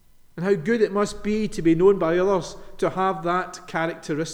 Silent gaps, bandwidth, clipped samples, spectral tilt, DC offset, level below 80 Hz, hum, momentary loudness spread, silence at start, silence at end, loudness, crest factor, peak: none; 11.5 kHz; under 0.1%; -6 dB/octave; under 0.1%; -46 dBFS; none; 10 LU; 0.35 s; 0 s; -23 LUFS; 16 dB; -6 dBFS